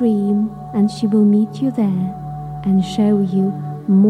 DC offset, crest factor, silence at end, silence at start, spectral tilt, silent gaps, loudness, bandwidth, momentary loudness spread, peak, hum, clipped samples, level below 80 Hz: under 0.1%; 12 dB; 0 s; 0 s; -9 dB/octave; none; -17 LUFS; 9.6 kHz; 10 LU; -4 dBFS; none; under 0.1%; -48 dBFS